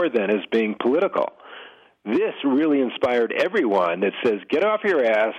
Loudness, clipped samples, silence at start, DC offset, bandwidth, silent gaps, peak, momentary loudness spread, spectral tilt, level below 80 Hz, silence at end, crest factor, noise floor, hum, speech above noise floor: -21 LUFS; under 0.1%; 0 s; under 0.1%; 8.6 kHz; none; -8 dBFS; 7 LU; -6.5 dB/octave; -68 dBFS; 0 s; 14 dB; -45 dBFS; none; 24 dB